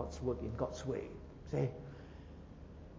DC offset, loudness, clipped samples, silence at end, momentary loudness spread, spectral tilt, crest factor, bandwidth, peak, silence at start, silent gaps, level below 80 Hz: under 0.1%; -41 LUFS; under 0.1%; 0 s; 16 LU; -7.5 dB/octave; 20 dB; 7.8 kHz; -22 dBFS; 0 s; none; -52 dBFS